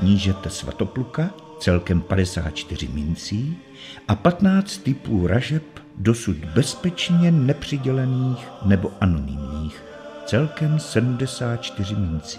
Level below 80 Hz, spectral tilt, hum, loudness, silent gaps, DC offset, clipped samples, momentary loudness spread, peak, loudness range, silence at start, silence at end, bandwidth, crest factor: -40 dBFS; -6.5 dB/octave; none; -22 LUFS; none; under 0.1%; under 0.1%; 11 LU; -2 dBFS; 3 LU; 0 s; 0 s; 13 kHz; 20 dB